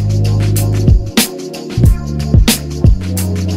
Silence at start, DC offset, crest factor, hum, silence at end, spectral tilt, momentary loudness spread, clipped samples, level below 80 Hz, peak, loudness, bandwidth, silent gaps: 0 s; under 0.1%; 12 dB; none; 0 s; -5.5 dB/octave; 6 LU; under 0.1%; -16 dBFS; 0 dBFS; -13 LUFS; 16.5 kHz; none